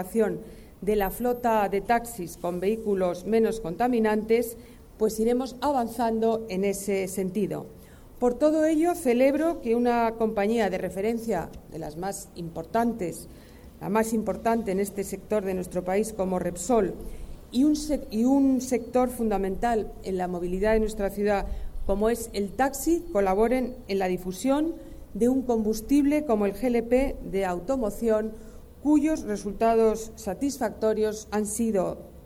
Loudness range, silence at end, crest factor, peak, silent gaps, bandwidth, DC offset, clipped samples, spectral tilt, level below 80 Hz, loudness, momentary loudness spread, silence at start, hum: 4 LU; 0 s; 16 dB; -10 dBFS; none; 17 kHz; under 0.1%; under 0.1%; -5.5 dB/octave; -44 dBFS; -26 LUFS; 11 LU; 0 s; none